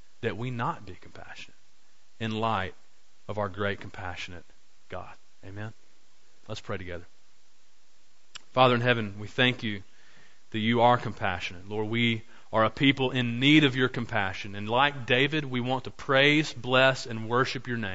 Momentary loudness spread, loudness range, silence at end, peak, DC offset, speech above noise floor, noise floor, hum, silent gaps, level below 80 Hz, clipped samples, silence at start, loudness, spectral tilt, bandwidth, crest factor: 20 LU; 17 LU; 0 s; -6 dBFS; 0.9%; 39 dB; -66 dBFS; none; none; -58 dBFS; under 0.1%; 0.25 s; -26 LUFS; -5.5 dB/octave; 8 kHz; 22 dB